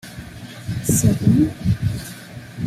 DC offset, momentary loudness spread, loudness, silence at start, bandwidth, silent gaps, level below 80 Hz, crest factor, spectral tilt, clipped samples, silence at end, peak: under 0.1%; 20 LU; -19 LUFS; 0.05 s; 15.5 kHz; none; -38 dBFS; 18 dB; -6 dB/octave; under 0.1%; 0 s; -2 dBFS